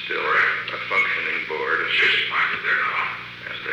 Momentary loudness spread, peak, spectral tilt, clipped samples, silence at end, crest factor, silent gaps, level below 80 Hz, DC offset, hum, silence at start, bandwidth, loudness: 10 LU; -8 dBFS; -3 dB/octave; under 0.1%; 0 s; 14 dB; none; -62 dBFS; under 0.1%; 60 Hz at -55 dBFS; 0 s; 19.5 kHz; -20 LUFS